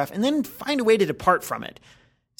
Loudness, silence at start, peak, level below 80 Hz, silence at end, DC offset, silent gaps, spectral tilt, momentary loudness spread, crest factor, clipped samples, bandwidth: -23 LUFS; 0 s; -4 dBFS; -56 dBFS; 0.7 s; under 0.1%; none; -5 dB/octave; 12 LU; 20 dB; under 0.1%; 19.5 kHz